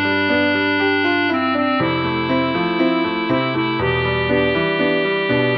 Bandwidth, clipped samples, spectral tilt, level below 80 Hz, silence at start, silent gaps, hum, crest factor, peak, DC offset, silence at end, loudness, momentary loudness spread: 6 kHz; under 0.1%; -8 dB/octave; -44 dBFS; 0 s; none; none; 12 dB; -6 dBFS; under 0.1%; 0 s; -18 LUFS; 2 LU